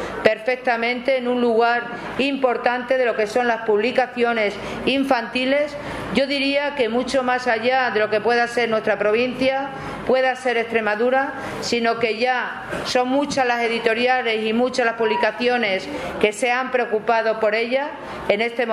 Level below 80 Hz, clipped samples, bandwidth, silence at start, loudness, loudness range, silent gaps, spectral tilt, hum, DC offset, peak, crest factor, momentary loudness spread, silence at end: -54 dBFS; under 0.1%; 13.5 kHz; 0 s; -20 LUFS; 1 LU; none; -4 dB/octave; none; under 0.1%; 0 dBFS; 20 dB; 5 LU; 0 s